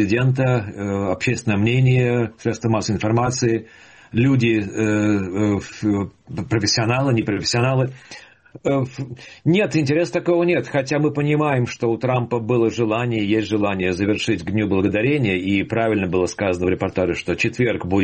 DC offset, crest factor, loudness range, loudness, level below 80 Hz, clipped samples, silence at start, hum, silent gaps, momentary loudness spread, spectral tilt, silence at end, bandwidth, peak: under 0.1%; 14 dB; 2 LU; -20 LUFS; -50 dBFS; under 0.1%; 0 s; none; none; 6 LU; -6 dB/octave; 0 s; 8.8 kHz; -6 dBFS